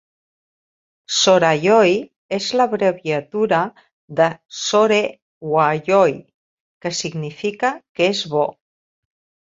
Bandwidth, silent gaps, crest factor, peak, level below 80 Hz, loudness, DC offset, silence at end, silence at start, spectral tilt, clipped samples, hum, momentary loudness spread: 7.8 kHz; 2.16-2.29 s, 3.93-4.08 s, 5.22-5.41 s, 6.34-6.81 s, 7.89-7.95 s; 18 dB; -2 dBFS; -64 dBFS; -18 LUFS; under 0.1%; 0.95 s; 1.1 s; -4 dB/octave; under 0.1%; none; 12 LU